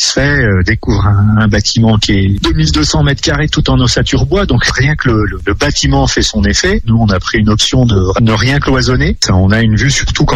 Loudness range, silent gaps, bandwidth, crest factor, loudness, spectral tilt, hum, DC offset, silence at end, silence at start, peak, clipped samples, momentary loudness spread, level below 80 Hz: 1 LU; none; 10.5 kHz; 10 dB; -10 LUFS; -5 dB/octave; none; under 0.1%; 0 s; 0 s; 0 dBFS; under 0.1%; 3 LU; -20 dBFS